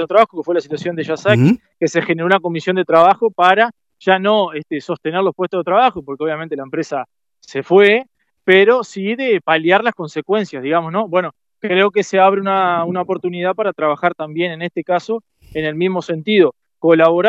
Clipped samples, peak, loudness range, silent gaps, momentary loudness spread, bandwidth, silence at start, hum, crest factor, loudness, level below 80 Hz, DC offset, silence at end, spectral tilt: under 0.1%; 0 dBFS; 4 LU; none; 12 LU; 8 kHz; 0 s; none; 16 dB; -16 LUFS; -60 dBFS; under 0.1%; 0 s; -6 dB/octave